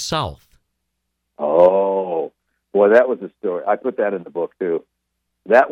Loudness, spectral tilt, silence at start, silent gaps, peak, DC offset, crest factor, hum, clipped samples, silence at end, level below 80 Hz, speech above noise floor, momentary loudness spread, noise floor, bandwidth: -18 LUFS; -5 dB/octave; 0 s; none; -2 dBFS; under 0.1%; 18 dB; none; under 0.1%; 0 s; -52 dBFS; 57 dB; 13 LU; -75 dBFS; 11.5 kHz